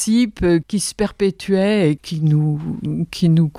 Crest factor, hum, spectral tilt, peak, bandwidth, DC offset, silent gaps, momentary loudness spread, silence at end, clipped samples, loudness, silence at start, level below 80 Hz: 14 dB; none; -6 dB/octave; -4 dBFS; 14 kHz; under 0.1%; none; 7 LU; 0 s; under 0.1%; -18 LUFS; 0 s; -40 dBFS